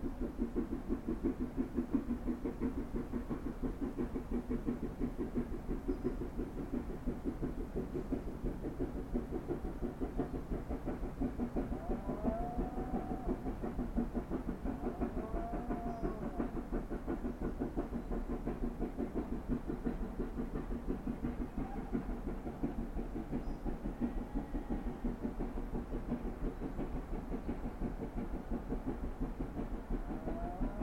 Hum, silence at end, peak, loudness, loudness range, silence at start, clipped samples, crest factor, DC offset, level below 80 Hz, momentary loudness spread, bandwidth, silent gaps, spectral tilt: none; 0 s; -22 dBFS; -41 LUFS; 3 LU; 0 s; under 0.1%; 18 dB; 0.1%; -44 dBFS; 4 LU; 16 kHz; none; -8.5 dB/octave